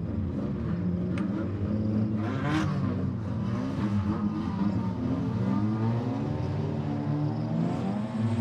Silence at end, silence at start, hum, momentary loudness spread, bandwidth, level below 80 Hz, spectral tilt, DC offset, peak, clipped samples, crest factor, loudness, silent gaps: 0 s; 0 s; none; 3 LU; 9 kHz; -50 dBFS; -9 dB/octave; under 0.1%; -16 dBFS; under 0.1%; 12 dB; -29 LUFS; none